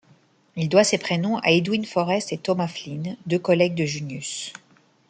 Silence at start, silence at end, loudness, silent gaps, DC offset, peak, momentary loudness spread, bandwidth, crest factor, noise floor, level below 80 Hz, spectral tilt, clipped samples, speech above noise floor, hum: 0.55 s; 0.5 s; -23 LUFS; none; under 0.1%; -2 dBFS; 12 LU; 9.4 kHz; 20 dB; -58 dBFS; -66 dBFS; -5 dB/octave; under 0.1%; 35 dB; none